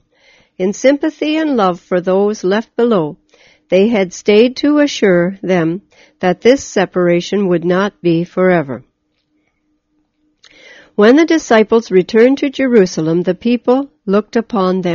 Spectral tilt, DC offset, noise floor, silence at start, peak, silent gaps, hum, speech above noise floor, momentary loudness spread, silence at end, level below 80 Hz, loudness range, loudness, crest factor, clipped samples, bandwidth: -5 dB/octave; under 0.1%; -63 dBFS; 0.6 s; 0 dBFS; none; none; 51 dB; 6 LU; 0 s; -54 dBFS; 4 LU; -13 LUFS; 14 dB; under 0.1%; 7.4 kHz